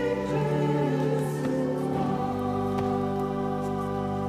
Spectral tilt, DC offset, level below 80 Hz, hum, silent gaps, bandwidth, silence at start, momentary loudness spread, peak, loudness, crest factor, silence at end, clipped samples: -8 dB/octave; under 0.1%; -50 dBFS; none; none; 15 kHz; 0 s; 4 LU; -14 dBFS; -28 LUFS; 12 dB; 0 s; under 0.1%